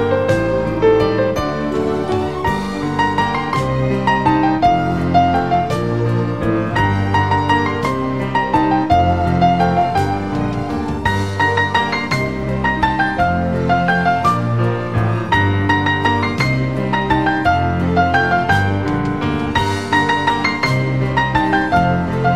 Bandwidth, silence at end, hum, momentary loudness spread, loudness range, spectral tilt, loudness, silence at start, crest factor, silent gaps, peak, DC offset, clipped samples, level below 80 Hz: 14 kHz; 0 s; none; 5 LU; 2 LU; -6.5 dB/octave; -16 LUFS; 0 s; 16 dB; none; 0 dBFS; 1%; under 0.1%; -34 dBFS